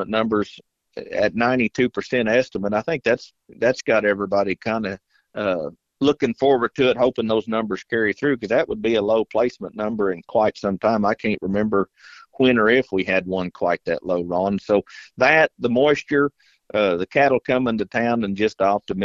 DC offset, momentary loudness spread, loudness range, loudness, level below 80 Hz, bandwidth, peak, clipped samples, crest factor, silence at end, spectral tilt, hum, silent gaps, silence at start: under 0.1%; 7 LU; 3 LU; -21 LUFS; -54 dBFS; 7.6 kHz; 0 dBFS; under 0.1%; 20 dB; 0 s; -6 dB/octave; none; none; 0 s